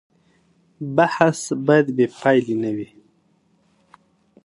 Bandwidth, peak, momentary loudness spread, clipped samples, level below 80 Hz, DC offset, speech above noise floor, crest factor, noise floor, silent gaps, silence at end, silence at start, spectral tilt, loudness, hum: 11.5 kHz; 0 dBFS; 13 LU; under 0.1%; -66 dBFS; under 0.1%; 43 dB; 22 dB; -62 dBFS; none; 1.6 s; 0.8 s; -6 dB/octave; -19 LUFS; none